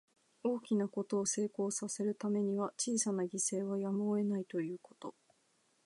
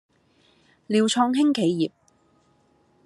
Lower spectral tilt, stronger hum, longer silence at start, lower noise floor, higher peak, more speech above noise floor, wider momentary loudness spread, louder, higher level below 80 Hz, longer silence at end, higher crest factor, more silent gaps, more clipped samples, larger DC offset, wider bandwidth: about the same, -5 dB/octave vs -5 dB/octave; neither; second, 0.45 s vs 0.9 s; first, -75 dBFS vs -63 dBFS; second, -20 dBFS vs -8 dBFS; about the same, 39 dB vs 42 dB; about the same, 7 LU vs 7 LU; second, -36 LUFS vs -22 LUFS; second, -88 dBFS vs -74 dBFS; second, 0.75 s vs 1.15 s; about the same, 16 dB vs 18 dB; neither; neither; neither; about the same, 11.5 kHz vs 12 kHz